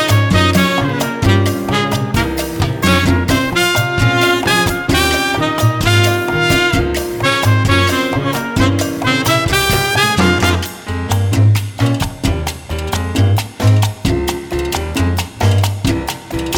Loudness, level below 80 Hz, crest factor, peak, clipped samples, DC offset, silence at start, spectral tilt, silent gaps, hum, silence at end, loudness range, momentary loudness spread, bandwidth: -14 LUFS; -28 dBFS; 14 dB; 0 dBFS; under 0.1%; under 0.1%; 0 s; -5 dB/octave; none; none; 0 s; 3 LU; 7 LU; over 20 kHz